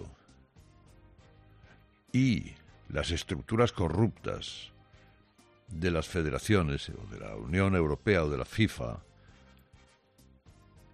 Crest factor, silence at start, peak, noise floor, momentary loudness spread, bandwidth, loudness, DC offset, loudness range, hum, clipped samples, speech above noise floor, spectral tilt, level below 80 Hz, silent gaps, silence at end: 22 dB; 0 s; -12 dBFS; -63 dBFS; 15 LU; 13.5 kHz; -31 LUFS; under 0.1%; 4 LU; none; under 0.1%; 33 dB; -6 dB/octave; -50 dBFS; none; 1.95 s